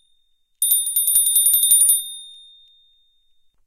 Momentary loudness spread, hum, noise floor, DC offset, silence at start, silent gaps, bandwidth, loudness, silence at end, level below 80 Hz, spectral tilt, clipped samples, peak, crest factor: 12 LU; none; -62 dBFS; under 0.1%; 0.6 s; none; 16.5 kHz; -14 LUFS; 1.35 s; -60 dBFS; 4.5 dB/octave; under 0.1%; -2 dBFS; 18 dB